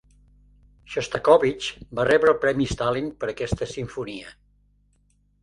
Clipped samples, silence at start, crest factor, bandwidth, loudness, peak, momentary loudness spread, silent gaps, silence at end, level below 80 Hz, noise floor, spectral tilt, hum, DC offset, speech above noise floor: under 0.1%; 0.9 s; 22 dB; 11.5 kHz; -23 LUFS; -4 dBFS; 15 LU; none; 1.1 s; -46 dBFS; -64 dBFS; -5 dB/octave; 50 Hz at -55 dBFS; under 0.1%; 41 dB